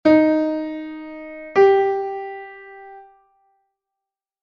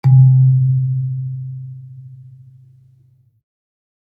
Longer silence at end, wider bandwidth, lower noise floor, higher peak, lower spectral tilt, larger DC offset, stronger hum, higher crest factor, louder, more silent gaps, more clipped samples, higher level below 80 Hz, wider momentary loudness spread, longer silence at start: second, 1.4 s vs 1.85 s; first, 6.2 kHz vs 2.3 kHz; first, -86 dBFS vs -53 dBFS; about the same, -4 dBFS vs -2 dBFS; second, -6.5 dB/octave vs -12 dB/octave; neither; neither; about the same, 18 dB vs 14 dB; second, -19 LUFS vs -14 LUFS; neither; neither; first, -60 dBFS vs -66 dBFS; about the same, 24 LU vs 26 LU; about the same, 0.05 s vs 0.05 s